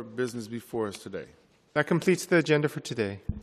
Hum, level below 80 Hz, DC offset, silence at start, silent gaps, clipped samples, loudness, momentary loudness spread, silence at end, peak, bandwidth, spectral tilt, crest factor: none; -52 dBFS; under 0.1%; 0 s; none; under 0.1%; -28 LUFS; 14 LU; 0 s; -10 dBFS; 14 kHz; -5.5 dB/octave; 20 dB